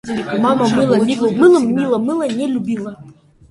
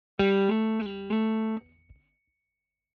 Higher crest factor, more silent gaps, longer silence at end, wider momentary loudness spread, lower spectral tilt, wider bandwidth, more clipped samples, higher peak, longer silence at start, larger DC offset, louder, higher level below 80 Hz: about the same, 16 dB vs 18 dB; neither; second, 0.4 s vs 1.35 s; about the same, 10 LU vs 9 LU; about the same, -6.5 dB/octave vs -5.5 dB/octave; first, 11.5 kHz vs 5.6 kHz; neither; first, 0 dBFS vs -10 dBFS; second, 0.05 s vs 0.2 s; neither; first, -15 LUFS vs -27 LUFS; first, -54 dBFS vs -60 dBFS